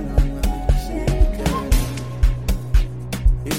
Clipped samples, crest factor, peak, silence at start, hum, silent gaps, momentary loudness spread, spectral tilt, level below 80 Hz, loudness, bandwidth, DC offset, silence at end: under 0.1%; 14 dB; -4 dBFS; 0 s; none; none; 3 LU; -6 dB/octave; -20 dBFS; -22 LUFS; 16 kHz; 0.8%; 0 s